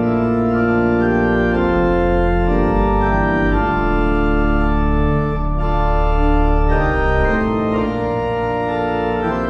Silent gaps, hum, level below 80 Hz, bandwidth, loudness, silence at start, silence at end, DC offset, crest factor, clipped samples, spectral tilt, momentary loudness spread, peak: none; none; -20 dBFS; 6 kHz; -17 LUFS; 0 s; 0 s; under 0.1%; 12 dB; under 0.1%; -9 dB/octave; 4 LU; -2 dBFS